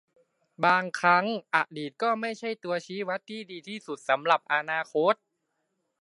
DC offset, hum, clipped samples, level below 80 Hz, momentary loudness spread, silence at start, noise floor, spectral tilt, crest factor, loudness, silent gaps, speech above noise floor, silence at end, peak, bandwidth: under 0.1%; none; under 0.1%; -84 dBFS; 13 LU; 0.6 s; -79 dBFS; -4.5 dB/octave; 22 dB; -27 LUFS; none; 51 dB; 0.85 s; -6 dBFS; 11.5 kHz